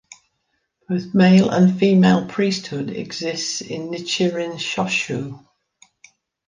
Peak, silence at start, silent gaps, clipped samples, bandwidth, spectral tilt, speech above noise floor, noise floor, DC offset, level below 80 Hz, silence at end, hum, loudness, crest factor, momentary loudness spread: -2 dBFS; 0.9 s; none; under 0.1%; 9.6 kHz; -5.5 dB/octave; 53 dB; -72 dBFS; under 0.1%; -60 dBFS; 1.1 s; none; -19 LUFS; 18 dB; 14 LU